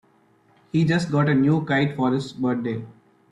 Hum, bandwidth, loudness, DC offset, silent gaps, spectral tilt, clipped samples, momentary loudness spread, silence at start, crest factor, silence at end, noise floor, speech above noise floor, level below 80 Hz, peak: none; 11 kHz; -22 LUFS; under 0.1%; none; -7.5 dB/octave; under 0.1%; 8 LU; 0.75 s; 14 dB; 0.4 s; -59 dBFS; 38 dB; -58 dBFS; -8 dBFS